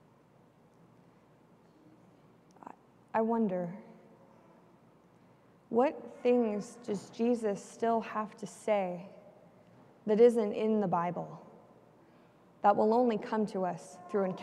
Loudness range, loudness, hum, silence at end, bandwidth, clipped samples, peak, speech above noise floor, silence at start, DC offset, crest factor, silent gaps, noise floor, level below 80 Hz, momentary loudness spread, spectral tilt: 7 LU; -31 LUFS; none; 0 s; 11.5 kHz; under 0.1%; -12 dBFS; 32 dB; 3.15 s; under 0.1%; 22 dB; none; -63 dBFS; -82 dBFS; 18 LU; -7 dB/octave